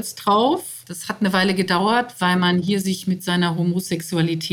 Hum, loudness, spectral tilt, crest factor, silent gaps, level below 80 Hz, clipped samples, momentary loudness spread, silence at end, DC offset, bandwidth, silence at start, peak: none; -20 LUFS; -5 dB/octave; 16 dB; none; -62 dBFS; under 0.1%; 6 LU; 0 s; under 0.1%; 18 kHz; 0 s; -4 dBFS